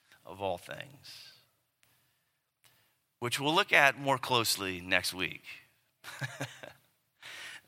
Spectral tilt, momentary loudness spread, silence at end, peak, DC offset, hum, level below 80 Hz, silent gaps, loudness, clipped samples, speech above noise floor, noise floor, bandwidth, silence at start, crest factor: -2.5 dB/octave; 26 LU; 0.1 s; -6 dBFS; under 0.1%; none; -76 dBFS; none; -30 LUFS; under 0.1%; 47 dB; -79 dBFS; 16.5 kHz; 0.3 s; 28 dB